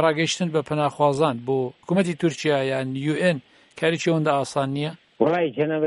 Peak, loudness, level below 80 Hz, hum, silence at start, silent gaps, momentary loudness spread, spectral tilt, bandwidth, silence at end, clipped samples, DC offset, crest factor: -4 dBFS; -23 LUFS; -66 dBFS; none; 0 s; none; 5 LU; -5.5 dB/octave; 11.5 kHz; 0 s; under 0.1%; under 0.1%; 18 dB